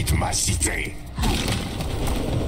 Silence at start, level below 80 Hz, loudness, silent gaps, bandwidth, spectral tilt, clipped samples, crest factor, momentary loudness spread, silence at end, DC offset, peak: 0 s; -28 dBFS; -24 LUFS; none; 16 kHz; -3.5 dB/octave; under 0.1%; 14 dB; 7 LU; 0 s; under 0.1%; -10 dBFS